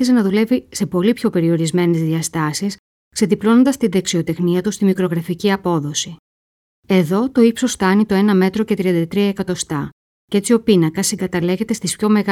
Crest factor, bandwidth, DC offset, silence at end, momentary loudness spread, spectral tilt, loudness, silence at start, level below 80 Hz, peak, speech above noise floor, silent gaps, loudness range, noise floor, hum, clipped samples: 14 dB; 16 kHz; under 0.1%; 0 s; 8 LU; -5.5 dB/octave; -17 LUFS; 0 s; -52 dBFS; -2 dBFS; over 74 dB; 2.79-3.11 s, 6.19-6.83 s, 9.92-10.28 s; 2 LU; under -90 dBFS; none; under 0.1%